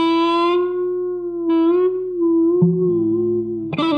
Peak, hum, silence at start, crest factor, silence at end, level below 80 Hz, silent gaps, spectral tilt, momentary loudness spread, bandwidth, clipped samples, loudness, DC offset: -4 dBFS; none; 0 s; 14 dB; 0 s; -56 dBFS; none; -8.5 dB/octave; 7 LU; 5.2 kHz; under 0.1%; -18 LUFS; under 0.1%